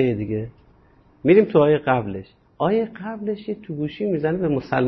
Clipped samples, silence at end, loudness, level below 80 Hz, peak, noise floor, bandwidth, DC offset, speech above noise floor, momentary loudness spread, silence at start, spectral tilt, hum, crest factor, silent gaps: under 0.1%; 0 s; -21 LUFS; -52 dBFS; -4 dBFS; -54 dBFS; 5.8 kHz; under 0.1%; 34 dB; 13 LU; 0 s; -10 dB/octave; none; 18 dB; none